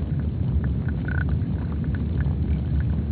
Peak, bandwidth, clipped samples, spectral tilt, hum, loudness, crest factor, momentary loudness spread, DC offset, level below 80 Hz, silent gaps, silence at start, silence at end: -12 dBFS; 4.4 kHz; under 0.1%; -9 dB/octave; none; -25 LUFS; 12 dB; 2 LU; under 0.1%; -28 dBFS; none; 0 s; 0 s